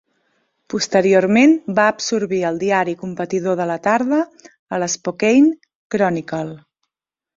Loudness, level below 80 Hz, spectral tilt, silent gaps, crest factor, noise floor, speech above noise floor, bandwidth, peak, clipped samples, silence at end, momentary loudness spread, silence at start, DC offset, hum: -18 LUFS; -60 dBFS; -5 dB/octave; 4.59-4.66 s, 5.75-5.90 s; 16 dB; -84 dBFS; 68 dB; 7.8 kHz; -2 dBFS; under 0.1%; 0.8 s; 13 LU; 0.7 s; under 0.1%; none